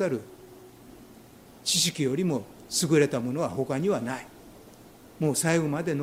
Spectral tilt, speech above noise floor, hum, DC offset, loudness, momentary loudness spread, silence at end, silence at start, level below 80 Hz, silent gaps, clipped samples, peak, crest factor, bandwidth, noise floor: -4 dB/octave; 24 dB; none; under 0.1%; -27 LUFS; 12 LU; 0 s; 0 s; -62 dBFS; none; under 0.1%; -10 dBFS; 20 dB; 16 kHz; -51 dBFS